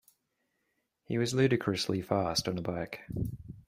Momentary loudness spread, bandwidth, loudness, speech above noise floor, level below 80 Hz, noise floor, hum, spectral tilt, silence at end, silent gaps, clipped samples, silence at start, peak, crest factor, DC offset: 10 LU; 16 kHz; -32 LUFS; 49 dB; -56 dBFS; -80 dBFS; none; -5 dB/octave; 0.05 s; none; under 0.1%; 1.1 s; -12 dBFS; 20 dB; under 0.1%